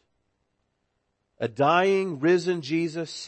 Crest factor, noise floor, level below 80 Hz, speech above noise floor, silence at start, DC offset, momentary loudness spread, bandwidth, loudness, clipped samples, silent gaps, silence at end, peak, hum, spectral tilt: 18 dB; -76 dBFS; -74 dBFS; 52 dB; 1.4 s; under 0.1%; 10 LU; 8.8 kHz; -24 LUFS; under 0.1%; none; 0 s; -8 dBFS; none; -5.5 dB/octave